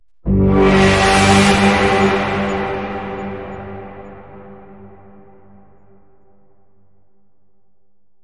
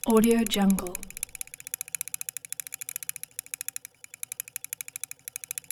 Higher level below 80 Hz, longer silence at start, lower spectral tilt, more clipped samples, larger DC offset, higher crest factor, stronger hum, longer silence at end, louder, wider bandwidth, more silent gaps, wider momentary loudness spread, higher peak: first, -32 dBFS vs -54 dBFS; first, 0.25 s vs 0.05 s; about the same, -5 dB/octave vs -4 dB/octave; neither; first, 0.6% vs under 0.1%; second, 16 dB vs 22 dB; first, 50 Hz at -45 dBFS vs none; second, 3.35 s vs 4.45 s; first, -14 LUFS vs -30 LUFS; second, 11.5 kHz vs over 20 kHz; neither; first, 21 LU vs 14 LU; first, -2 dBFS vs -10 dBFS